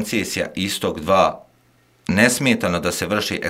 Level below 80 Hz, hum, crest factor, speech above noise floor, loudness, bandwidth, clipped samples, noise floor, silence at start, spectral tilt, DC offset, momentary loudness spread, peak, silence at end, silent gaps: -50 dBFS; none; 20 dB; 38 dB; -19 LUFS; 16 kHz; under 0.1%; -57 dBFS; 0 s; -4 dB/octave; under 0.1%; 8 LU; 0 dBFS; 0 s; none